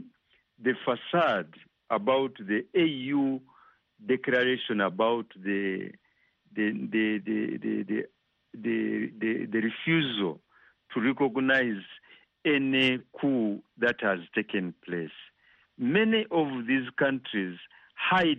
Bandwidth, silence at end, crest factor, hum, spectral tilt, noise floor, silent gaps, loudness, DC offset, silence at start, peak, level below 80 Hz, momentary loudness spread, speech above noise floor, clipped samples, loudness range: 6.2 kHz; 0 s; 18 dB; none; -3 dB/octave; -68 dBFS; none; -28 LUFS; under 0.1%; 0 s; -10 dBFS; -72 dBFS; 11 LU; 40 dB; under 0.1%; 3 LU